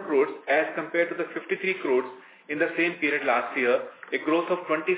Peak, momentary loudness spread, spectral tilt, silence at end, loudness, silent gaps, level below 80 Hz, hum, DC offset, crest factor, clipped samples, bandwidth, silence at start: -10 dBFS; 6 LU; -8 dB/octave; 0 s; -26 LUFS; none; -88 dBFS; none; under 0.1%; 16 dB; under 0.1%; 4 kHz; 0 s